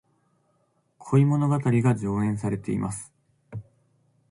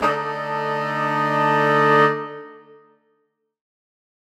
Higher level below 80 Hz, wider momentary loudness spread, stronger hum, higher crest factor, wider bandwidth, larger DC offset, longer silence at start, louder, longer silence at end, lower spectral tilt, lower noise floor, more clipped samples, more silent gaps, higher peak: first, -56 dBFS vs -66 dBFS; first, 20 LU vs 12 LU; neither; about the same, 18 dB vs 18 dB; second, 11.5 kHz vs 15 kHz; neither; first, 1 s vs 0 s; second, -24 LUFS vs -19 LUFS; second, 0.7 s vs 1.75 s; first, -8 dB/octave vs -6 dB/octave; about the same, -69 dBFS vs -70 dBFS; neither; neither; second, -10 dBFS vs -4 dBFS